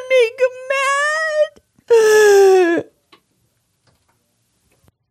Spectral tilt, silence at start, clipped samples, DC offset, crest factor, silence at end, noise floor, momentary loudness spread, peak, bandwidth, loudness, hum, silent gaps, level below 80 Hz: -2 dB/octave; 0 s; under 0.1%; under 0.1%; 14 dB; 2.3 s; -65 dBFS; 10 LU; -4 dBFS; 16 kHz; -14 LUFS; none; none; -70 dBFS